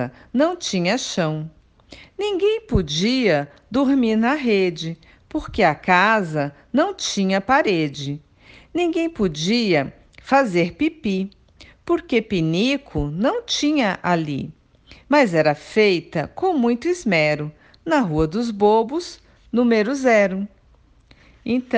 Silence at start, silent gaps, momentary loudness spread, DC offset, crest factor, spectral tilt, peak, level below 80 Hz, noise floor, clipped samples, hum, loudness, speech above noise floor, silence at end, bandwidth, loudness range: 0 s; none; 13 LU; under 0.1%; 20 dB; -5 dB/octave; 0 dBFS; -44 dBFS; -54 dBFS; under 0.1%; none; -20 LUFS; 34 dB; 0 s; 9.8 kHz; 2 LU